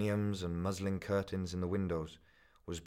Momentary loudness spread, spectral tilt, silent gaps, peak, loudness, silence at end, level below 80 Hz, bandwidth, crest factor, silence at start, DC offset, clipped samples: 10 LU; -6.5 dB/octave; none; -22 dBFS; -37 LUFS; 0 s; -58 dBFS; 15.5 kHz; 16 dB; 0 s; under 0.1%; under 0.1%